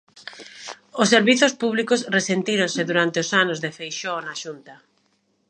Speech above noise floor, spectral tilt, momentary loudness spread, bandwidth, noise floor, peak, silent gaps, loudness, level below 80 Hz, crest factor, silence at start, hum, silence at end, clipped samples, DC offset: 46 dB; -3.5 dB/octave; 20 LU; 10 kHz; -67 dBFS; 0 dBFS; none; -20 LUFS; -76 dBFS; 22 dB; 0.15 s; none; 0.75 s; under 0.1%; under 0.1%